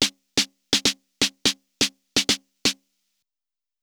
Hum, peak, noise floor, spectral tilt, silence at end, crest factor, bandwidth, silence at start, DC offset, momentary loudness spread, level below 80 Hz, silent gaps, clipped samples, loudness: none; 0 dBFS; under -90 dBFS; -1 dB/octave; 1.1 s; 26 dB; over 20 kHz; 0 s; under 0.1%; 4 LU; -58 dBFS; none; under 0.1%; -23 LUFS